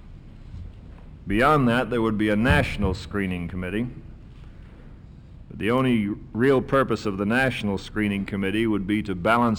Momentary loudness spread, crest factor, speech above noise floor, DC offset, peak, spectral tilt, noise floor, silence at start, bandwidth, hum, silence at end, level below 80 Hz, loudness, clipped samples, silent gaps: 18 LU; 16 dB; 21 dB; under 0.1%; -8 dBFS; -7 dB/octave; -44 dBFS; 0 s; 16.5 kHz; none; 0 s; -40 dBFS; -23 LUFS; under 0.1%; none